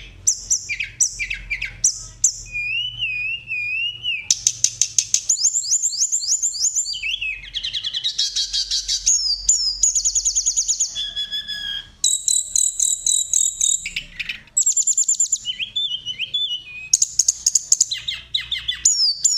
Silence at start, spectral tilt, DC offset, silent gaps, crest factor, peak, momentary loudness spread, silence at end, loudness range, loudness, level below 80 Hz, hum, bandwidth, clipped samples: 0 s; 3.5 dB/octave; under 0.1%; none; 20 dB; -2 dBFS; 9 LU; 0 s; 3 LU; -18 LUFS; -48 dBFS; none; 16 kHz; under 0.1%